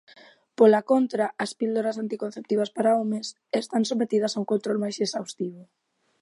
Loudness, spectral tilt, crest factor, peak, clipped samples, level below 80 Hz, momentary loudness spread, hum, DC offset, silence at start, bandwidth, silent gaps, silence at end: -25 LUFS; -5 dB/octave; 20 dB; -6 dBFS; under 0.1%; -80 dBFS; 12 LU; none; under 0.1%; 0.6 s; 11.5 kHz; none; 0.6 s